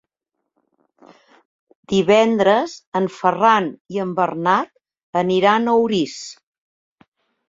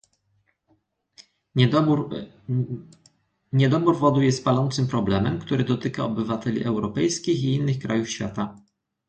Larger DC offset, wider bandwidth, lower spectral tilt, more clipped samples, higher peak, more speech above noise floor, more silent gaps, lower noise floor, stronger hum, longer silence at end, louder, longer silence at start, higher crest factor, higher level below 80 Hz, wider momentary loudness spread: neither; second, 7.8 kHz vs 9 kHz; about the same, -5.5 dB/octave vs -6.5 dB/octave; neither; first, -2 dBFS vs -6 dBFS; first, 62 dB vs 46 dB; first, 2.87-2.92 s, 3.80-3.85 s, 5.03-5.13 s vs none; first, -79 dBFS vs -69 dBFS; neither; first, 1.15 s vs 0.5 s; first, -18 LUFS vs -23 LUFS; first, 1.9 s vs 1.2 s; about the same, 18 dB vs 18 dB; second, -62 dBFS vs -52 dBFS; about the same, 11 LU vs 10 LU